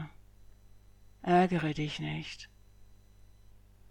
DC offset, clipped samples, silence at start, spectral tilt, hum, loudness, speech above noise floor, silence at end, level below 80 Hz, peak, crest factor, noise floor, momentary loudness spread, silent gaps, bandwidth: under 0.1%; under 0.1%; 0 s; -6.5 dB/octave; 50 Hz at -60 dBFS; -31 LUFS; 27 dB; 0.35 s; -58 dBFS; -14 dBFS; 22 dB; -57 dBFS; 21 LU; none; 10 kHz